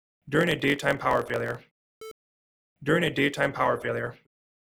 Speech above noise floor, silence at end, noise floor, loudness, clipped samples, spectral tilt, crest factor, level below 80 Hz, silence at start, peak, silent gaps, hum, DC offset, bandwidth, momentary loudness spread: over 64 dB; 0.6 s; under -90 dBFS; -26 LUFS; under 0.1%; -5.5 dB/octave; 20 dB; -58 dBFS; 0.25 s; -8 dBFS; 1.71-2.01 s, 2.11-2.76 s; none; under 0.1%; 18 kHz; 19 LU